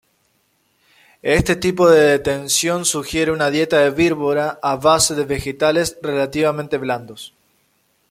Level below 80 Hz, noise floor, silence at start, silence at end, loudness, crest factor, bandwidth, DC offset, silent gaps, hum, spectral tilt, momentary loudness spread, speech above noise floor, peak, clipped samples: -44 dBFS; -63 dBFS; 1.25 s; 0.85 s; -17 LUFS; 16 dB; 16 kHz; under 0.1%; none; none; -3.5 dB/octave; 10 LU; 46 dB; -2 dBFS; under 0.1%